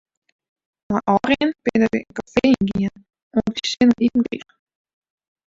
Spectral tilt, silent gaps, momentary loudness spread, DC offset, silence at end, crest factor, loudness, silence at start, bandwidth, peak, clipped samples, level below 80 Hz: -5.5 dB/octave; 3.22-3.31 s; 9 LU; under 0.1%; 1.1 s; 18 dB; -20 LUFS; 0.9 s; 7.8 kHz; -2 dBFS; under 0.1%; -50 dBFS